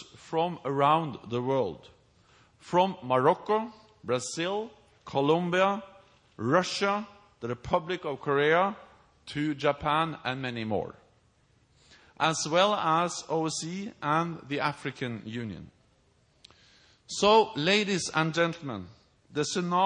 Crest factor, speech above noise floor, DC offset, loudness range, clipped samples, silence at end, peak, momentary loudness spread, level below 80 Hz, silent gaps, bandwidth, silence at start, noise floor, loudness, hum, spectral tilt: 20 dB; 38 dB; under 0.1%; 5 LU; under 0.1%; 0 s; -8 dBFS; 13 LU; -64 dBFS; none; 10.5 kHz; 0 s; -66 dBFS; -28 LUFS; none; -4.5 dB/octave